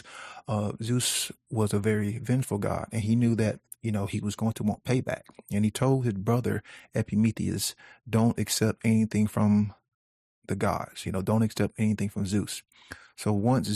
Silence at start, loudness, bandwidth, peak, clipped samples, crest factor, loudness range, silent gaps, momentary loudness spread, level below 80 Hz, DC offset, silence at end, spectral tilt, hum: 0.05 s; -28 LUFS; 14 kHz; -12 dBFS; under 0.1%; 16 dB; 2 LU; 9.94-10.42 s; 10 LU; -60 dBFS; under 0.1%; 0 s; -5.5 dB/octave; none